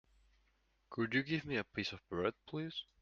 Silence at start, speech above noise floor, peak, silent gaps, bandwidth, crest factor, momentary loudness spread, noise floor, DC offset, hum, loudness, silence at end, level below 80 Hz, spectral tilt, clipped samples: 0.9 s; 37 dB; -20 dBFS; none; 7.4 kHz; 20 dB; 9 LU; -76 dBFS; under 0.1%; none; -40 LUFS; 0.2 s; -70 dBFS; -6 dB/octave; under 0.1%